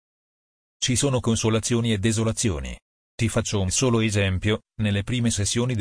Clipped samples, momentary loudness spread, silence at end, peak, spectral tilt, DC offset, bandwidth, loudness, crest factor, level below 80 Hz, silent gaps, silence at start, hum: under 0.1%; 5 LU; 0 s; -10 dBFS; -4.5 dB/octave; under 0.1%; 10.5 kHz; -23 LUFS; 14 dB; -42 dBFS; 2.82-3.18 s; 0.8 s; none